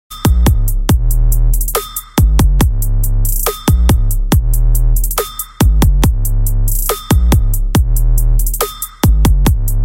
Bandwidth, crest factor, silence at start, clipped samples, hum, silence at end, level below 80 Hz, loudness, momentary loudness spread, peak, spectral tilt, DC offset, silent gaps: 17.5 kHz; 10 dB; 0.1 s; under 0.1%; none; 0 s; -12 dBFS; -14 LUFS; 5 LU; 0 dBFS; -5.5 dB/octave; under 0.1%; none